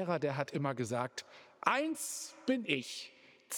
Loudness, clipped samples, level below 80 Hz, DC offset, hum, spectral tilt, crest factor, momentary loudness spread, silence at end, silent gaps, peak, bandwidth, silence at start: -36 LUFS; under 0.1%; -86 dBFS; under 0.1%; none; -4 dB/octave; 24 dB; 12 LU; 0 s; none; -12 dBFS; over 20 kHz; 0 s